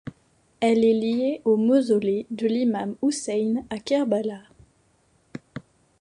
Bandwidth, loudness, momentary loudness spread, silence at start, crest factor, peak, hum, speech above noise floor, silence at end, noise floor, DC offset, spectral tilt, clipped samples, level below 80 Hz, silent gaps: 11 kHz; -23 LUFS; 22 LU; 0.05 s; 16 dB; -8 dBFS; none; 41 dB; 0.4 s; -64 dBFS; under 0.1%; -5.5 dB/octave; under 0.1%; -64 dBFS; none